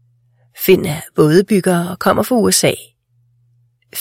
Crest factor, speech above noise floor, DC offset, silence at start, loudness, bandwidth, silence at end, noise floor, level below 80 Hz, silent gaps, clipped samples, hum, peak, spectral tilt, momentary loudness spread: 16 dB; 44 dB; under 0.1%; 0.55 s; -14 LUFS; 16.5 kHz; 0 s; -58 dBFS; -50 dBFS; none; under 0.1%; none; 0 dBFS; -4.5 dB/octave; 8 LU